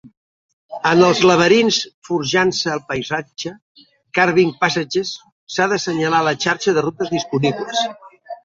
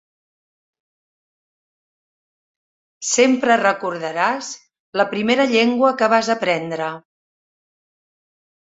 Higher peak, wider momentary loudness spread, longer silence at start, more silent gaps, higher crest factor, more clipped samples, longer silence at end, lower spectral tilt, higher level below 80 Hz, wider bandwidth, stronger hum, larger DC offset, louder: about the same, 0 dBFS vs -2 dBFS; about the same, 13 LU vs 13 LU; second, 0.05 s vs 3 s; first, 0.17-0.69 s, 1.94-2.02 s, 3.62-3.75 s, 5.32-5.47 s vs 4.80-4.93 s; about the same, 18 dB vs 20 dB; neither; second, 0.1 s vs 1.75 s; about the same, -4 dB/octave vs -3 dB/octave; first, -58 dBFS vs -68 dBFS; about the same, 7.8 kHz vs 8 kHz; neither; neither; about the same, -17 LUFS vs -18 LUFS